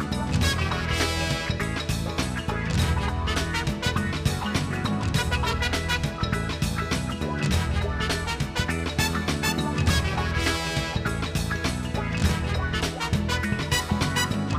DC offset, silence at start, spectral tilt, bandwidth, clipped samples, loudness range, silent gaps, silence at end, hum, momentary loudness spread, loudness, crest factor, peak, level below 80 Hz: under 0.1%; 0 s; -4.5 dB/octave; 15.5 kHz; under 0.1%; 1 LU; none; 0 s; none; 4 LU; -26 LUFS; 16 dB; -10 dBFS; -34 dBFS